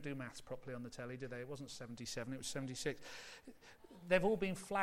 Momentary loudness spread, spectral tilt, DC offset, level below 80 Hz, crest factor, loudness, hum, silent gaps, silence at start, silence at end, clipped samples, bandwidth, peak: 20 LU; -4.5 dB/octave; under 0.1%; -66 dBFS; 22 dB; -42 LUFS; none; none; 0 s; 0 s; under 0.1%; 16.5 kHz; -20 dBFS